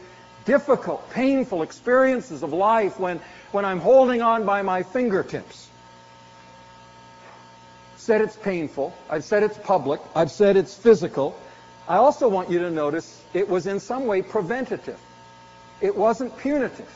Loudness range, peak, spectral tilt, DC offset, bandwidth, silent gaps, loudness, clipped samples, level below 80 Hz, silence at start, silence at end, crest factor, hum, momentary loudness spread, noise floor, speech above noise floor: 8 LU; -4 dBFS; -5 dB/octave; under 0.1%; 8 kHz; none; -22 LUFS; under 0.1%; -60 dBFS; 0 s; 0.1 s; 18 dB; 60 Hz at -55 dBFS; 12 LU; -48 dBFS; 26 dB